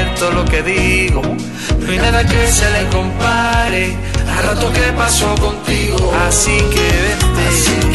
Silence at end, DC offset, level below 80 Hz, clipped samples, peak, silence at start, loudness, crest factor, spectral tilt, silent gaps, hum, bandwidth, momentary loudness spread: 0 s; 1%; -18 dBFS; under 0.1%; 0 dBFS; 0 s; -13 LUFS; 14 dB; -4 dB/octave; none; none; 12.5 kHz; 5 LU